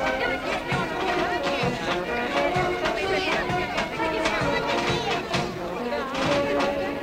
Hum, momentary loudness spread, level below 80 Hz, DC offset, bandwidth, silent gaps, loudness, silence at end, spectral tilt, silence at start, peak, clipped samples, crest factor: none; 4 LU; -46 dBFS; under 0.1%; 16 kHz; none; -25 LUFS; 0 s; -4.5 dB/octave; 0 s; -10 dBFS; under 0.1%; 14 dB